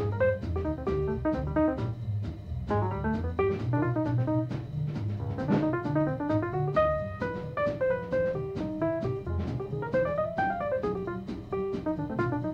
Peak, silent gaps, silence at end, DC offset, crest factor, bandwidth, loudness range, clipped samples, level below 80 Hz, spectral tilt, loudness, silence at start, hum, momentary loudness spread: -14 dBFS; none; 0 s; under 0.1%; 14 dB; 7.2 kHz; 2 LU; under 0.1%; -44 dBFS; -9.5 dB/octave; -30 LUFS; 0 s; none; 6 LU